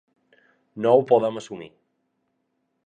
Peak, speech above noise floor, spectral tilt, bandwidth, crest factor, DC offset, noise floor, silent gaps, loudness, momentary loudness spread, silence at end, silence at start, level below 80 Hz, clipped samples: -4 dBFS; 53 dB; -6.5 dB/octave; 9.2 kHz; 22 dB; under 0.1%; -74 dBFS; none; -20 LUFS; 21 LU; 1.2 s; 0.75 s; -74 dBFS; under 0.1%